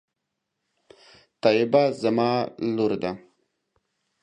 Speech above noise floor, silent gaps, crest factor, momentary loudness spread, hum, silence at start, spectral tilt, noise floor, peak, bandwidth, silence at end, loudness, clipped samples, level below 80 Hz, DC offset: 59 dB; none; 20 dB; 10 LU; none; 1.45 s; -7 dB/octave; -81 dBFS; -6 dBFS; 10 kHz; 1.05 s; -23 LUFS; under 0.1%; -66 dBFS; under 0.1%